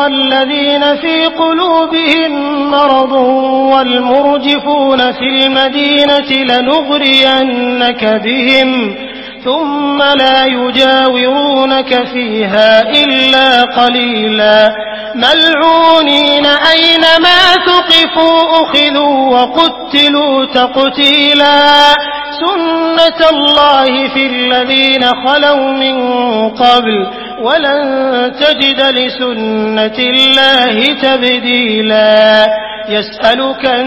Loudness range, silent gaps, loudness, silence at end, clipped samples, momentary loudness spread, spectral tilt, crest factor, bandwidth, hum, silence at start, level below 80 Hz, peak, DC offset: 4 LU; none; -8 LUFS; 0 s; 0.7%; 7 LU; -4 dB/octave; 8 dB; 8 kHz; none; 0 s; -46 dBFS; 0 dBFS; under 0.1%